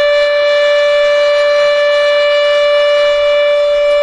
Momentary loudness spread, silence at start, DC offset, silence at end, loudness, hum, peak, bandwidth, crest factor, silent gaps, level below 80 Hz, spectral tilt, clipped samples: 1 LU; 0 s; under 0.1%; 0 s; -10 LUFS; none; -2 dBFS; 9.8 kHz; 8 dB; none; -46 dBFS; 0 dB/octave; under 0.1%